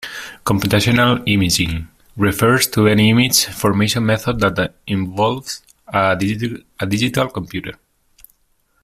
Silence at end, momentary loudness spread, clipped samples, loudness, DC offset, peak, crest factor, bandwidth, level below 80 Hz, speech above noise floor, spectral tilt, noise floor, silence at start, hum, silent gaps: 1.1 s; 14 LU; under 0.1%; -16 LUFS; under 0.1%; 0 dBFS; 18 dB; 16 kHz; -42 dBFS; 45 dB; -4.5 dB/octave; -62 dBFS; 0 s; none; none